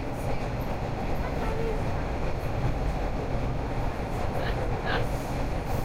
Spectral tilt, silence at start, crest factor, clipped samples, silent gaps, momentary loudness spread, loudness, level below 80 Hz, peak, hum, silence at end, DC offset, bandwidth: -6.5 dB/octave; 0 s; 14 dB; under 0.1%; none; 3 LU; -31 LUFS; -32 dBFS; -14 dBFS; none; 0 s; under 0.1%; 16 kHz